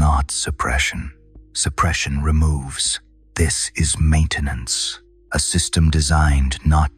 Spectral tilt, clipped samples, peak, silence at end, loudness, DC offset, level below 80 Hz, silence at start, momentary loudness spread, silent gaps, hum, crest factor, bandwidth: -3.5 dB/octave; under 0.1%; -6 dBFS; 0.1 s; -19 LUFS; under 0.1%; -24 dBFS; 0 s; 8 LU; none; none; 14 dB; 13.5 kHz